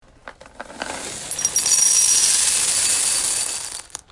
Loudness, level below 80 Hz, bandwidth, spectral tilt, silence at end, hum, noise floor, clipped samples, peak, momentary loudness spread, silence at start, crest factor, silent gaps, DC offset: -15 LUFS; -54 dBFS; 11.5 kHz; 2 dB/octave; 0.15 s; none; -43 dBFS; under 0.1%; -2 dBFS; 17 LU; 0.25 s; 20 dB; none; under 0.1%